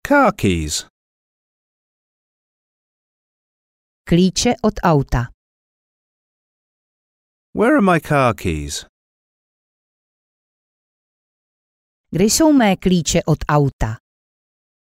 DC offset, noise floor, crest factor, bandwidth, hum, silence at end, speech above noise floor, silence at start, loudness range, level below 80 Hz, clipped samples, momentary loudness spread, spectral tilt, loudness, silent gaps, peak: under 0.1%; under -90 dBFS; 16 dB; 16 kHz; none; 1.05 s; over 74 dB; 0.05 s; 9 LU; -38 dBFS; under 0.1%; 13 LU; -5 dB/octave; -17 LUFS; 0.90-4.05 s, 5.34-7.53 s, 8.89-12.04 s, 13.73-13.79 s; -4 dBFS